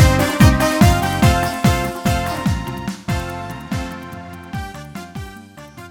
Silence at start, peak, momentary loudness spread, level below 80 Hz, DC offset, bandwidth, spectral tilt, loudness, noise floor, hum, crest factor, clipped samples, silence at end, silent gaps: 0 s; 0 dBFS; 20 LU; -26 dBFS; under 0.1%; 19 kHz; -5.5 dB/octave; -17 LUFS; -38 dBFS; none; 18 dB; under 0.1%; 0 s; none